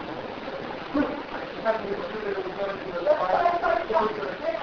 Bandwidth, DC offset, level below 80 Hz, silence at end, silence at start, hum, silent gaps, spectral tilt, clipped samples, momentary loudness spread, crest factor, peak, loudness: 5.4 kHz; under 0.1%; -54 dBFS; 0 s; 0 s; none; none; -6.5 dB/octave; under 0.1%; 11 LU; 18 dB; -10 dBFS; -27 LUFS